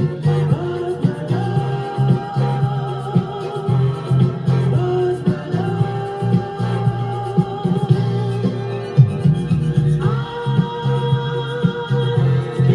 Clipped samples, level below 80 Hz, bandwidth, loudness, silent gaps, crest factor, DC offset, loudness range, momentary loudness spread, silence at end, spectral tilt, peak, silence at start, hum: under 0.1%; -46 dBFS; 10 kHz; -19 LUFS; none; 18 dB; under 0.1%; 2 LU; 4 LU; 0 s; -9 dB/octave; 0 dBFS; 0 s; none